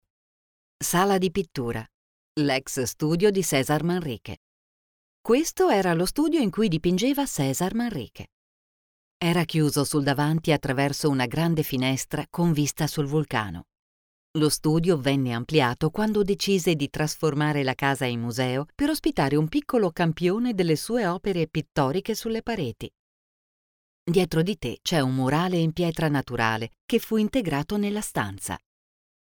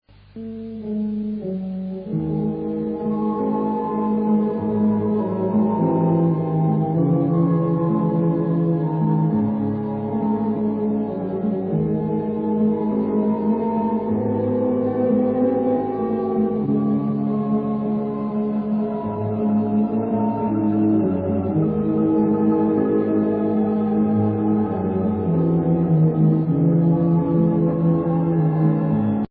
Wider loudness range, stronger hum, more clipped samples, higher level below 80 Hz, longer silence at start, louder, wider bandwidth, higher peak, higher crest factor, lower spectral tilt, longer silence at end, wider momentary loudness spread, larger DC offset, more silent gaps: about the same, 3 LU vs 4 LU; neither; neither; about the same, -50 dBFS vs -52 dBFS; first, 0.8 s vs 0.35 s; second, -25 LUFS vs -21 LUFS; first, over 20 kHz vs 3.7 kHz; about the same, -8 dBFS vs -8 dBFS; first, 18 dB vs 12 dB; second, -5.5 dB/octave vs -14.5 dB/octave; first, 0.65 s vs 0.05 s; about the same, 8 LU vs 6 LU; neither; first, 1.94-2.35 s, 4.37-5.24 s, 8.32-9.20 s, 13.79-14.34 s, 22.99-24.06 s, 26.81-26.88 s vs none